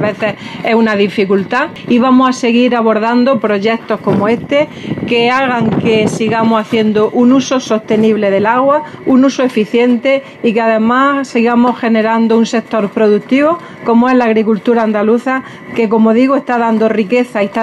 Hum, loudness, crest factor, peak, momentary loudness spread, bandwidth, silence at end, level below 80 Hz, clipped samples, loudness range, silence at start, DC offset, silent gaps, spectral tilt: none; -12 LUFS; 10 dB; 0 dBFS; 5 LU; 10.5 kHz; 0 s; -54 dBFS; under 0.1%; 1 LU; 0 s; under 0.1%; none; -6 dB/octave